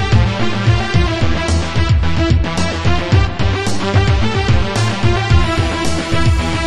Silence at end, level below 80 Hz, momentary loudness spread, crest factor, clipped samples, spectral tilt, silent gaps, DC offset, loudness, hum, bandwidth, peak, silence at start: 0 s; -20 dBFS; 3 LU; 14 dB; under 0.1%; -5.5 dB/octave; none; under 0.1%; -15 LUFS; none; 12 kHz; 0 dBFS; 0 s